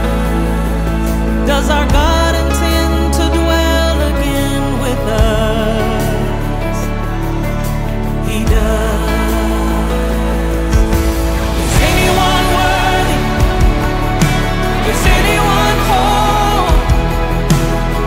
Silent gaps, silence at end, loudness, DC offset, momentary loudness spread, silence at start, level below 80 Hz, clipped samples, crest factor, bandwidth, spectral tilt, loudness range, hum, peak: none; 0 s; -14 LUFS; under 0.1%; 6 LU; 0 s; -16 dBFS; under 0.1%; 12 dB; 16.5 kHz; -5 dB/octave; 4 LU; none; 0 dBFS